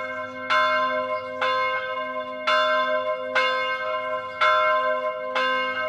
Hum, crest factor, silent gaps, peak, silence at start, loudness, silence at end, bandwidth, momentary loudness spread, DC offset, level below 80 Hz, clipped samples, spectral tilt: none; 16 dB; none; -8 dBFS; 0 s; -23 LUFS; 0 s; 10.5 kHz; 8 LU; under 0.1%; -72 dBFS; under 0.1%; -2.5 dB/octave